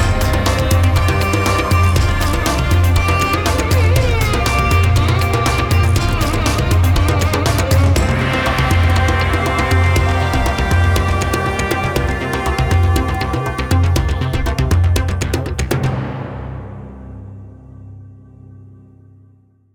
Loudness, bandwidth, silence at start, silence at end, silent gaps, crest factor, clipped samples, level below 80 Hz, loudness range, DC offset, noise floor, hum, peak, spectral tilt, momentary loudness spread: -15 LUFS; 19.5 kHz; 0 s; 1.6 s; none; 14 dB; under 0.1%; -22 dBFS; 7 LU; under 0.1%; -50 dBFS; none; -2 dBFS; -5.5 dB/octave; 6 LU